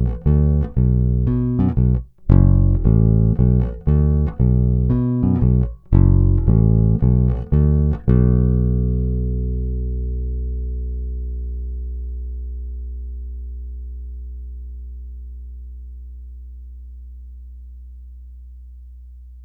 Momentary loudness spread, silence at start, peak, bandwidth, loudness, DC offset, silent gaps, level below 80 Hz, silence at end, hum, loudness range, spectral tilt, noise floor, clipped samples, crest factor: 22 LU; 0 s; 0 dBFS; 2.4 kHz; -18 LUFS; under 0.1%; none; -22 dBFS; 0 s; 60 Hz at -35 dBFS; 21 LU; -13.5 dB/octave; -39 dBFS; under 0.1%; 18 dB